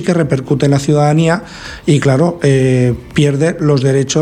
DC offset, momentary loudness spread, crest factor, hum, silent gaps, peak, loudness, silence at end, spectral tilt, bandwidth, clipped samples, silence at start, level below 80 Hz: under 0.1%; 4 LU; 12 dB; none; none; 0 dBFS; -13 LUFS; 0 s; -6.5 dB/octave; 11 kHz; under 0.1%; 0 s; -40 dBFS